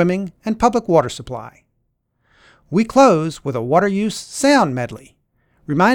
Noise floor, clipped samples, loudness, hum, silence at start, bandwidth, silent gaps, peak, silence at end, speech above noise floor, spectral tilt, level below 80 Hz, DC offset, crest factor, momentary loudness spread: -69 dBFS; under 0.1%; -17 LUFS; none; 0 s; 17 kHz; none; 0 dBFS; 0 s; 52 dB; -5.5 dB/octave; -48 dBFS; under 0.1%; 18 dB; 16 LU